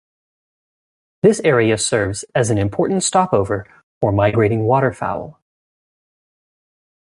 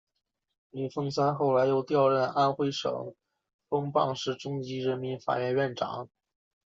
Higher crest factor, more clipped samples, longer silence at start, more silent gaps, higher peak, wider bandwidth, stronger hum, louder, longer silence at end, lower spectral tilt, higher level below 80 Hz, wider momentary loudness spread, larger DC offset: about the same, 18 dB vs 16 dB; neither; first, 1.25 s vs 0.75 s; first, 3.83-4.01 s vs 3.54-3.59 s; first, -2 dBFS vs -12 dBFS; first, 11.5 kHz vs 7.6 kHz; neither; first, -17 LUFS vs -29 LUFS; first, 1.7 s vs 0.6 s; about the same, -5 dB/octave vs -6 dB/octave; first, -44 dBFS vs -72 dBFS; second, 9 LU vs 12 LU; neither